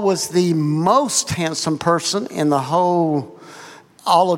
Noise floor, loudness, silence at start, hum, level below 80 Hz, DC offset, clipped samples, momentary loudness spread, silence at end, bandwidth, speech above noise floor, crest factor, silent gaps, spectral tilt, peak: -41 dBFS; -18 LUFS; 0 s; none; -58 dBFS; under 0.1%; under 0.1%; 14 LU; 0 s; 16.5 kHz; 24 dB; 16 dB; none; -4.5 dB/octave; -2 dBFS